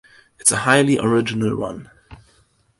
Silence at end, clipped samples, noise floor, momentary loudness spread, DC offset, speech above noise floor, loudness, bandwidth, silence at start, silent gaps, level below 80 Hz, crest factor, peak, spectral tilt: 0.65 s; under 0.1%; -59 dBFS; 13 LU; under 0.1%; 41 dB; -18 LUFS; 11.5 kHz; 0.4 s; none; -52 dBFS; 20 dB; 0 dBFS; -4 dB/octave